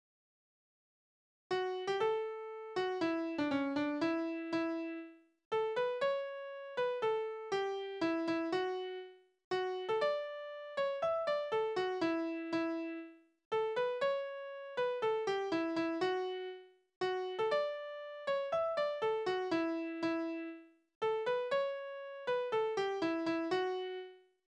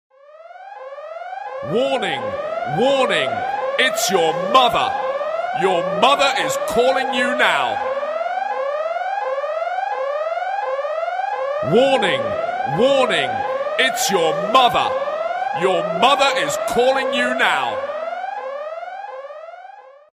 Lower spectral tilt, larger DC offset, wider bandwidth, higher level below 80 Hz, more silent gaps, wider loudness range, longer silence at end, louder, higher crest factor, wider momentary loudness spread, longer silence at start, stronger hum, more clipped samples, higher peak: first, -5 dB/octave vs -3 dB/octave; neither; second, 9.2 kHz vs 15.5 kHz; second, -80 dBFS vs -58 dBFS; first, 5.45-5.51 s, 9.44-9.51 s, 13.45-13.51 s, 16.96-17.01 s, 20.95-21.01 s vs none; second, 1 LU vs 5 LU; about the same, 0.3 s vs 0.3 s; second, -37 LUFS vs -19 LUFS; second, 14 dB vs 20 dB; second, 9 LU vs 15 LU; first, 1.5 s vs 0.35 s; neither; neither; second, -22 dBFS vs 0 dBFS